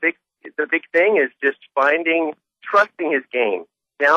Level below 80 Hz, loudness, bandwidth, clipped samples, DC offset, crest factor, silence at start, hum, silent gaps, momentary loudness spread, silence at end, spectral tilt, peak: -78 dBFS; -19 LUFS; 7.6 kHz; under 0.1%; under 0.1%; 16 dB; 0 s; none; none; 10 LU; 0 s; -4.5 dB/octave; -4 dBFS